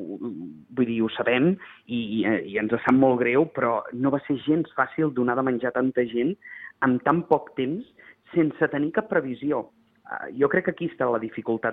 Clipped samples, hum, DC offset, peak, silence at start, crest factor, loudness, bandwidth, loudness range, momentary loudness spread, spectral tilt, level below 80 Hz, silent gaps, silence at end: under 0.1%; none; under 0.1%; -4 dBFS; 0 s; 20 dB; -25 LUFS; 4 kHz; 3 LU; 12 LU; -9.5 dB/octave; -66 dBFS; none; 0 s